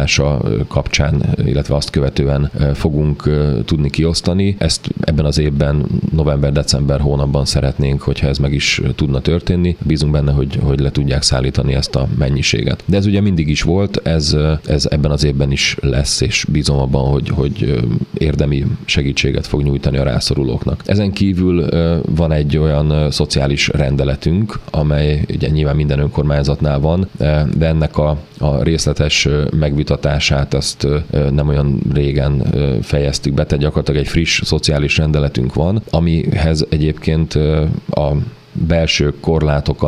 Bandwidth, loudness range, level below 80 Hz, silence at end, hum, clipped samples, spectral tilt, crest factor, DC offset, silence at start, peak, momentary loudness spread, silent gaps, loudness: 12 kHz; 1 LU; -24 dBFS; 0 s; none; under 0.1%; -5.5 dB/octave; 14 dB; under 0.1%; 0 s; 0 dBFS; 3 LU; none; -15 LUFS